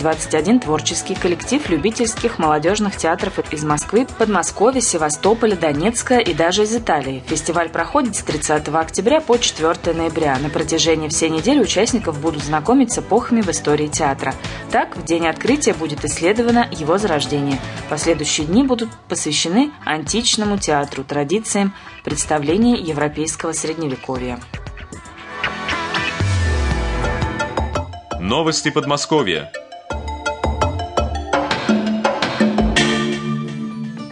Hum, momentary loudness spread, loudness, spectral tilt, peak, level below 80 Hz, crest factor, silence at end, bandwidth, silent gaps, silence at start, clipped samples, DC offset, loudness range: none; 9 LU; -18 LUFS; -4 dB/octave; -2 dBFS; -34 dBFS; 16 dB; 0 s; 11 kHz; none; 0 s; under 0.1%; under 0.1%; 4 LU